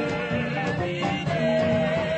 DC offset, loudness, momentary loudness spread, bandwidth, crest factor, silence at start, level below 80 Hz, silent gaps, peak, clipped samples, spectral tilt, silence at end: under 0.1%; -25 LUFS; 4 LU; 8.6 kHz; 12 dB; 0 s; -50 dBFS; none; -12 dBFS; under 0.1%; -6.5 dB/octave; 0 s